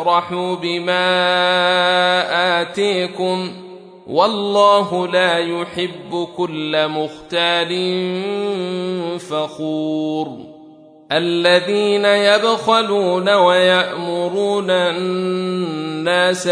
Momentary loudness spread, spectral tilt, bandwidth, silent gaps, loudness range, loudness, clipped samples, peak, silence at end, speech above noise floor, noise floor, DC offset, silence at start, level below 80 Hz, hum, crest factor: 10 LU; -4.5 dB/octave; 10.5 kHz; none; 6 LU; -17 LUFS; under 0.1%; -2 dBFS; 0 s; 26 dB; -43 dBFS; under 0.1%; 0 s; -66 dBFS; none; 16 dB